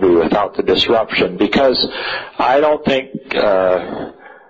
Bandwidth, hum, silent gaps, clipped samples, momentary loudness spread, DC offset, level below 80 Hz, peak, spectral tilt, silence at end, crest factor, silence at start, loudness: 7.8 kHz; none; none; under 0.1%; 9 LU; under 0.1%; -44 dBFS; -4 dBFS; -6 dB/octave; 0.15 s; 12 dB; 0 s; -15 LUFS